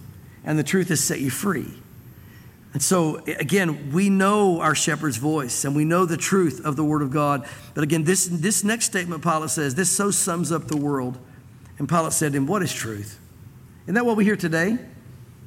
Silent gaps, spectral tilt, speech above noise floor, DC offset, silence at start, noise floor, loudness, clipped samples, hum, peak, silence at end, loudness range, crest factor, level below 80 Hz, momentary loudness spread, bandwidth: none; -4.5 dB/octave; 24 dB; under 0.1%; 0 s; -45 dBFS; -22 LUFS; under 0.1%; none; -8 dBFS; 0 s; 4 LU; 16 dB; -58 dBFS; 9 LU; 16.5 kHz